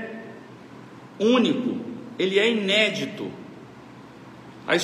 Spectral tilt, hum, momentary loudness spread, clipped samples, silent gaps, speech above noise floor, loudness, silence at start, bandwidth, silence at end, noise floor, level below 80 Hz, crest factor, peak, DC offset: -4.5 dB/octave; none; 24 LU; under 0.1%; none; 22 dB; -22 LUFS; 0 s; 13 kHz; 0 s; -44 dBFS; -70 dBFS; 20 dB; -6 dBFS; under 0.1%